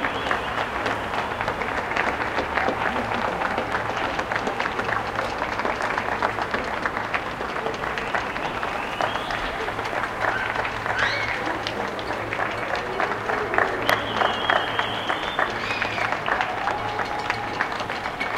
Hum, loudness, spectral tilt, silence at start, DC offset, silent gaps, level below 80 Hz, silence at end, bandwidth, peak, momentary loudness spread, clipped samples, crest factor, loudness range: none; -25 LUFS; -4 dB/octave; 0 s; under 0.1%; none; -46 dBFS; 0 s; 16.5 kHz; -2 dBFS; 5 LU; under 0.1%; 24 dB; 3 LU